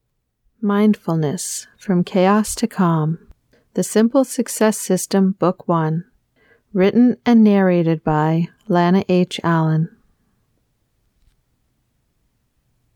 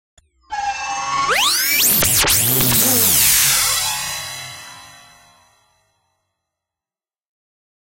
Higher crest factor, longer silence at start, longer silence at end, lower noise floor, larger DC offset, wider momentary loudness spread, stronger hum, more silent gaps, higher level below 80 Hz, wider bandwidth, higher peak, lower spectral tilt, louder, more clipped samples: about the same, 16 dB vs 18 dB; about the same, 0.6 s vs 0.5 s; about the same, 3.1 s vs 3.1 s; second, -66 dBFS vs under -90 dBFS; neither; second, 11 LU vs 16 LU; neither; neither; second, -54 dBFS vs -44 dBFS; about the same, 17.5 kHz vs 16.5 kHz; about the same, -4 dBFS vs -2 dBFS; first, -6 dB/octave vs -1 dB/octave; second, -18 LUFS vs -14 LUFS; neither